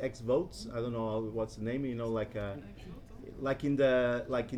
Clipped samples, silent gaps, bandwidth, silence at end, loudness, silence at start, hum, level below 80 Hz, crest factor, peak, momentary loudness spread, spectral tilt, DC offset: under 0.1%; none; 13 kHz; 0 s; -34 LUFS; 0 s; none; -54 dBFS; 18 dB; -16 dBFS; 20 LU; -7 dB/octave; under 0.1%